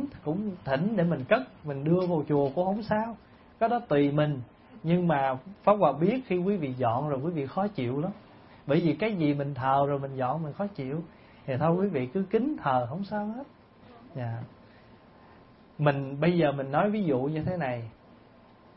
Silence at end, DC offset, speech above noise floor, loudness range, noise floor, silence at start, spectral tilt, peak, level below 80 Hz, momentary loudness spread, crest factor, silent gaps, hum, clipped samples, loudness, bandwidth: 0.85 s; under 0.1%; 28 dB; 5 LU; -55 dBFS; 0 s; -11.5 dB/octave; -8 dBFS; -62 dBFS; 12 LU; 20 dB; none; none; under 0.1%; -28 LUFS; 5.8 kHz